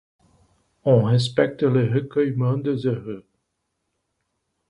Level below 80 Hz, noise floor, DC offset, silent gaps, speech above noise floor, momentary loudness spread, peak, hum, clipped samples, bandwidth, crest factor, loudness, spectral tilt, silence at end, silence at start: -60 dBFS; -76 dBFS; under 0.1%; none; 56 dB; 10 LU; -4 dBFS; none; under 0.1%; 10.5 kHz; 18 dB; -21 LUFS; -8 dB/octave; 1.5 s; 0.85 s